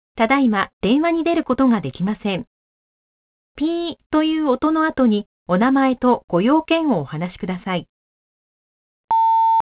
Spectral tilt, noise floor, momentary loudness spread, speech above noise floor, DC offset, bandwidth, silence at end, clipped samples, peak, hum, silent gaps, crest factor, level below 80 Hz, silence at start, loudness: -10.5 dB/octave; under -90 dBFS; 9 LU; over 72 dB; under 0.1%; 4 kHz; 0.1 s; under 0.1%; -2 dBFS; none; 0.73-0.81 s, 2.47-3.55 s, 4.06-4.10 s, 5.26-5.46 s, 6.24-6.28 s, 7.89-9.08 s; 16 dB; -52 dBFS; 0.15 s; -19 LUFS